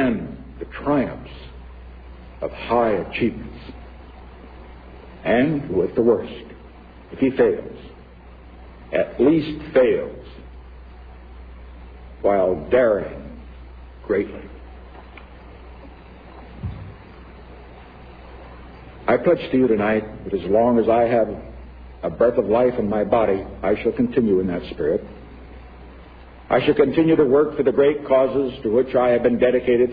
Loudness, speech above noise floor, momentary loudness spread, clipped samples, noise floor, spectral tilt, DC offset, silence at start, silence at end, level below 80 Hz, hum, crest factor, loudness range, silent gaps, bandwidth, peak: -20 LUFS; 24 dB; 25 LU; under 0.1%; -43 dBFS; -10.5 dB/octave; under 0.1%; 0 s; 0 s; -42 dBFS; none; 18 dB; 13 LU; none; 5 kHz; -4 dBFS